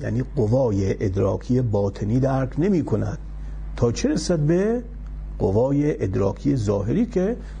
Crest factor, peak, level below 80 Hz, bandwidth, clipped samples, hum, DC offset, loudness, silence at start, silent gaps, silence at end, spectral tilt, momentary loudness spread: 14 dB; -8 dBFS; -34 dBFS; 10.5 kHz; under 0.1%; none; under 0.1%; -22 LUFS; 0 s; none; 0 s; -7.5 dB/octave; 9 LU